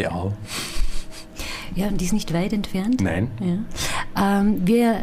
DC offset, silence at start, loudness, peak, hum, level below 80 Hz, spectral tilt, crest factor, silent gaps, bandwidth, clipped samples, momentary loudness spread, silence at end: under 0.1%; 0 s; -23 LUFS; -8 dBFS; none; -32 dBFS; -5.5 dB/octave; 14 dB; none; 15.5 kHz; under 0.1%; 13 LU; 0 s